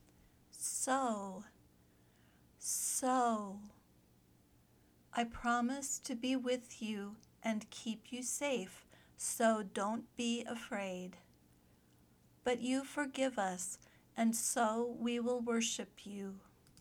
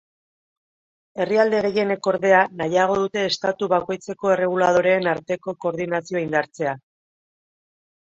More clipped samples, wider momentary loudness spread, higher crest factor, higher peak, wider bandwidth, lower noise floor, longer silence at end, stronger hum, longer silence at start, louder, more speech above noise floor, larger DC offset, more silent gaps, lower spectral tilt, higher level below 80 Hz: neither; first, 15 LU vs 10 LU; about the same, 20 dB vs 20 dB; second, -20 dBFS vs -2 dBFS; first, over 20 kHz vs 7.8 kHz; second, -68 dBFS vs under -90 dBFS; second, 0 s vs 1.4 s; neither; second, 0.55 s vs 1.15 s; second, -38 LUFS vs -21 LUFS; second, 31 dB vs over 69 dB; neither; neither; second, -3 dB/octave vs -5 dB/octave; second, -72 dBFS vs -64 dBFS